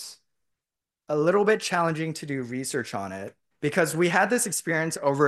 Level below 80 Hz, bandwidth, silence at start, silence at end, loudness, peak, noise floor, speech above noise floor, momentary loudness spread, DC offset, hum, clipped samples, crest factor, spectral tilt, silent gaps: -72 dBFS; 12.5 kHz; 0 s; 0 s; -25 LUFS; -6 dBFS; -89 dBFS; 64 dB; 12 LU; under 0.1%; none; under 0.1%; 20 dB; -4.5 dB/octave; none